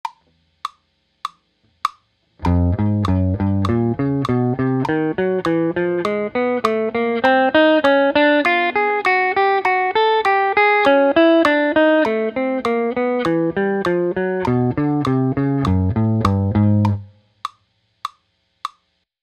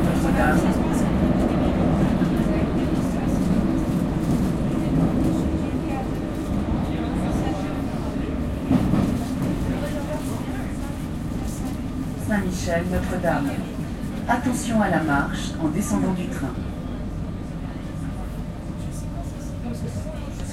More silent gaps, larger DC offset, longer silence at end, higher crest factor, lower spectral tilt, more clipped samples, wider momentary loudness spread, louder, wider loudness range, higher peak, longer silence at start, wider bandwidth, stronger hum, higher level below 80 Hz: neither; neither; first, 0.55 s vs 0 s; about the same, 18 dB vs 16 dB; about the same, -7.5 dB/octave vs -7 dB/octave; neither; first, 19 LU vs 10 LU; first, -17 LUFS vs -24 LUFS; about the same, 6 LU vs 7 LU; first, 0 dBFS vs -6 dBFS; about the same, 0.05 s vs 0 s; second, 11.5 kHz vs 16 kHz; neither; second, -42 dBFS vs -32 dBFS